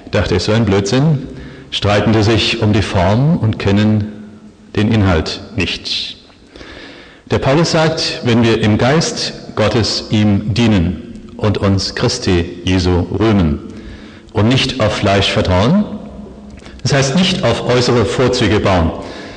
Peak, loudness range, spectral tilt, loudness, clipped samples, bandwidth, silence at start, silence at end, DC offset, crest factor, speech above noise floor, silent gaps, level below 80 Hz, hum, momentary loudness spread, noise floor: -2 dBFS; 3 LU; -5.5 dB/octave; -14 LUFS; under 0.1%; 9.8 kHz; 0 s; 0 s; under 0.1%; 12 dB; 24 dB; none; -34 dBFS; none; 15 LU; -38 dBFS